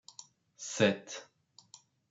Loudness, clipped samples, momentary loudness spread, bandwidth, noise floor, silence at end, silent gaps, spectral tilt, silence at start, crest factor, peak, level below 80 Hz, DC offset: -33 LUFS; under 0.1%; 25 LU; 8 kHz; -61 dBFS; 0.85 s; none; -4 dB/octave; 0.2 s; 26 dB; -12 dBFS; -82 dBFS; under 0.1%